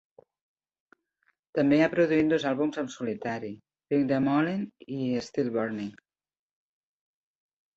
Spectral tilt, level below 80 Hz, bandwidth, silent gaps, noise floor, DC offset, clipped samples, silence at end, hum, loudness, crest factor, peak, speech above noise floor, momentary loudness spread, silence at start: -7 dB/octave; -66 dBFS; 7.8 kHz; none; -74 dBFS; under 0.1%; under 0.1%; 1.85 s; none; -28 LUFS; 18 dB; -10 dBFS; 47 dB; 14 LU; 1.55 s